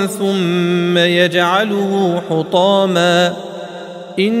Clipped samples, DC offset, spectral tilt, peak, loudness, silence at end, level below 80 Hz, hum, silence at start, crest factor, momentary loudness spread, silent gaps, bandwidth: under 0.1%; under 0.1%; -5.5 dB/octave; 0 dBFS; -14 LUFS; 0 s; -62 dBFS; none; 0 s; 14 dB; 15 LU; none; 15.5 kHz